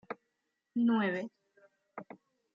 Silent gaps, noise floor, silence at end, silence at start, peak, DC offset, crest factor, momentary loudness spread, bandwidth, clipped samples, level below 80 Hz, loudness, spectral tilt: none; -83 dBFS; 0.5 s; 0.1 s; -20 dBFS; under 0.1%; 16 dB; 22 LU; 6.4 kHz; under 0.1%; -86 dBFS; -32 LUFS; -5 dB/octave